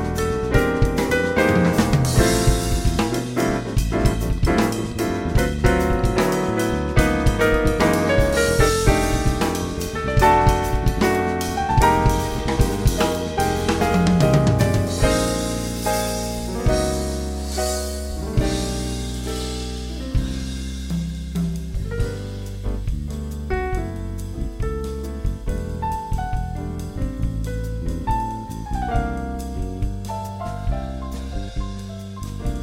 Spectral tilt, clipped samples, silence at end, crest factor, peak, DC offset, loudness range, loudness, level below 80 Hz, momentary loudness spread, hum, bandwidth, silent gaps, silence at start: -5.5 dB/octave; under 0.1%; 0 s; 20 dB; -2 dBFS; under 0.1%; 9 LU; -22 LUFS; -26 dBFS; 12 LU; none; 16 kHz; none; 0 s